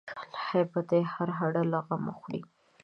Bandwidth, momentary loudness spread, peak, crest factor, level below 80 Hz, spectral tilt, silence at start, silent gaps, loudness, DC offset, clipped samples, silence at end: 6.2 kHz; 12 LU; -14 dBFS; 18 dB; -74 dBFS; -9 dB/octave; 0.05 s; none; -31 LUFS; under 0.1%; under 0.1%; 0.4 s